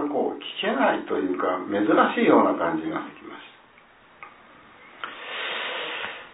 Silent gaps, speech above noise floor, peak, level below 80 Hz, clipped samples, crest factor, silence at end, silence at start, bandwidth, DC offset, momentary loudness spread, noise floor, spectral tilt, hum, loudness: none; 31 dB; -4 dBFS; -70 dBFS; under 0.1%; 22 dB; 0.05 s; 0 s; 4 kHz; under 0.1%; 20 LU; -54 dBFS; -8.5 dB/octave; none; -24 LUFS